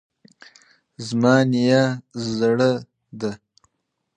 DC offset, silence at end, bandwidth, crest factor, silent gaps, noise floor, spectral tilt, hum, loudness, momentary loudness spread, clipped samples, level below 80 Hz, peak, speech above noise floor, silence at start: under 0.1%; 0.8 s; 9.6 kHz; 20 dB; none; -76 dBFS; -6.5 dB/octave; none; -20 LUFS; 13 LU; under 0.1%; -62 dBFS; -2 dBFS; 57 dB; 1 s